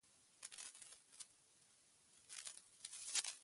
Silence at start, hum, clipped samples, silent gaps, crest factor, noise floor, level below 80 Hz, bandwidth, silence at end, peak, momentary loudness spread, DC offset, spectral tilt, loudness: 0.05 s; none; under 0.1%; none; 34 dB; -73 dBFS; under -90 dBFS; 11.5 kHz; 0 s; -20 dBFS; 27 LU; under 0.1%; 3 dB/octave; -50 LUFS